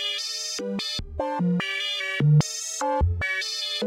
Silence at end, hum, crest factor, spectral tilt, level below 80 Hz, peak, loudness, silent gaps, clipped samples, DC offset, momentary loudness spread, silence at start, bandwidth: 0 s; none; 16 dB; -4 dB/octave; -40 dBFS; -10 dBFS; -25 LUFS; none; under 0.1%; under 0.1%; 8 LU; 0 s; 15 kHz